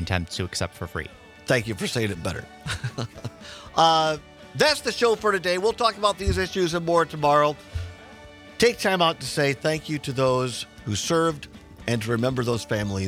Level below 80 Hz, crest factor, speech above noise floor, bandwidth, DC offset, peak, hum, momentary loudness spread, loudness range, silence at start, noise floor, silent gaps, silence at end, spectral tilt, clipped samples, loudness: -46 dBFS; 20 dB; 21 dB; 16.5 kHz; under 0.1%; -4 dBFS; none; 15 LU; 4 LU; 0 s; -45 dBFS; none; 0 s; -4.5 dB/octave; under 0.1%; -24 LUFS